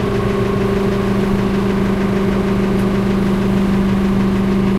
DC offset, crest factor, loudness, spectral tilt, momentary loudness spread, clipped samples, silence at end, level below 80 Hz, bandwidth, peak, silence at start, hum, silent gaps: under 0.1%; 10 dB; -16 LUFS; -7.5 dB/octave; 1 LU; under 0.1%; 0 s; -28 dBFS; 13.5 kHz; -4 dBFS; 0 s; none; none